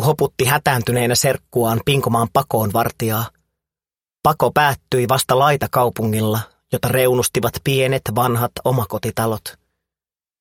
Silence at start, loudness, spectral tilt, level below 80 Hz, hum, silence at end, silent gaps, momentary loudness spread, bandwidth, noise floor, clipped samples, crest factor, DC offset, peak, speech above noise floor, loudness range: 0 s; -18 LUFS; -4.5 dB/octave; -48 dBFS; none; 0.9 s; none; 6 LU; 17 kHz; under -90 dBFS; under 0.1%; 18 dB; under 0.1%; 0 dBFS; over 72 dB; 2 LU